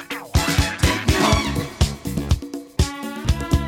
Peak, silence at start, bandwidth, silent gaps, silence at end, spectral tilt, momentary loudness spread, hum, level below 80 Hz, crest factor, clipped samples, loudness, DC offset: -2 dBFS; 0 s; 17.5 kHz; none; 0 s; -4.5 dB/octave; 7 LU; none; -26 dBFS; 18 dB; under 0.1%; -21 LUFS; under 0.1%